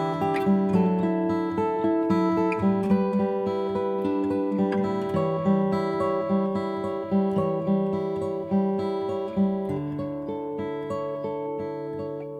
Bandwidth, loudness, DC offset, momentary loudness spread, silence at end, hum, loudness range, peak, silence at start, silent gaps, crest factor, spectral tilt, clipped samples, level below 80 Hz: 8.4 kHz; -26 LUFS; under 0.1%; 8 LU; 0 s; none; 4 LU; -10 dBFS; 0 s; none; 16 dB; -9 dB/octave; under 0.1%; -60 dBFS